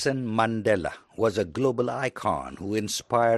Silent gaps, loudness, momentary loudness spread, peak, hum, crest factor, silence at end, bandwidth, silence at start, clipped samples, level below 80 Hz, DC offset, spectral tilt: none; -27 LUFS; 6 LU; -8 dBFS; none; 18 dB; 0 s; 12.5 kHz; 0 s; under 0.1%; -56 dBFS; under 0.1%; -5 dB/octave